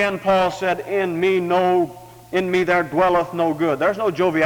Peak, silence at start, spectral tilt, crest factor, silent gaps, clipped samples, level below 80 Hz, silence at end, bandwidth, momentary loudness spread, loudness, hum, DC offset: -6 dBFS; 0 s; -6 dB/octave; 14 dB; none; under 0.1%; -52 dBFS; 0 s; 19.5 kHz; 5 LU; -19 LUFS; none; under 0.1%